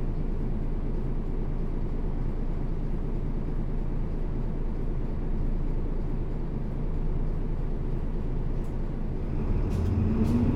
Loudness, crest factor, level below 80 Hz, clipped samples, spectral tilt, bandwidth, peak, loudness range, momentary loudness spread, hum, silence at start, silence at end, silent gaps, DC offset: -32 LUFS; 14 dB; -28 dBFS; under 0.1%; -9.5 dB/octave; 3.8 kHz; -14 dBFS; 2 LU; 6 LU; none; 0 s; 0 s; none; under 0.1%